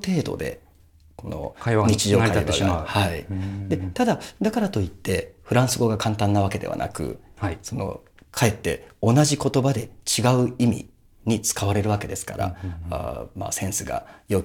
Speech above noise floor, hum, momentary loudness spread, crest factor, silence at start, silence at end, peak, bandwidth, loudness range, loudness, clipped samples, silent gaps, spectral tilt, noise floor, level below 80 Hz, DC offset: 30 dB; none; 13 LU; 20 dB; 0 s; 0 s; -4 dBFS; 18.5 kHz; 4 LU; -24 LUFS; under 0.1%; none; -5 dB/octave; -53 dBFS; -44 dBFS; under 0.1%